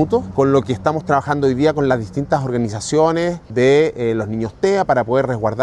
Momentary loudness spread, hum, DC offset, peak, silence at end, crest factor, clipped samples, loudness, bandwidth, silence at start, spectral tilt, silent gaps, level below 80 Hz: 6 LU; none; under 0.1%; 0 dBFS; 0 s; 16 dB; under 0.1%; -17 LUFS; 10.5 kHz; 0 s; -6.5 dB/octave; none; -44 dBFS